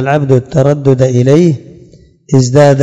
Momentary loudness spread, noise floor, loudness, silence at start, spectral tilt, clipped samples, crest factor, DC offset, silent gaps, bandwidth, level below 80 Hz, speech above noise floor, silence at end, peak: 5 LU; -40 dBFS; -9 LUFS; 0 s; -7.5 dB/octave; 3%; 10 dB; under 0.1%; none; 8.6 kHz; -44 dBFS; 32 dB; 0 s; 0 dBFS